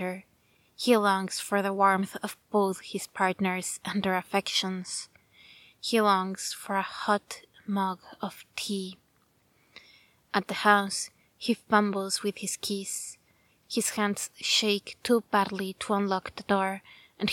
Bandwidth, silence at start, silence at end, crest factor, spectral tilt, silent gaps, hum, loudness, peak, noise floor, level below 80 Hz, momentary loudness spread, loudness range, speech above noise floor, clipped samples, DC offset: 17.5 kHz; 0 s; 0 s; 24 dB; -3.5 dB/octave; none; none; -28 LUFS; -6 dBFS; -68 dBFS; -70 dBFS; 13 LU; 5 LU; 39 dB; under 0.1%; under 0.1%